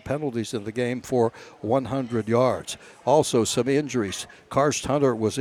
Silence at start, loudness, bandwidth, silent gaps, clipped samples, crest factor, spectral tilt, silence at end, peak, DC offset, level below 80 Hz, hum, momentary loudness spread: 0.05 s; -24 LUFS; 16.5 kHz; none; under 0.1%; 18 dB; -5 dB/octave; 0 s; -6 dBFS; under 0.1%; -56 dBFS; none; 9 LU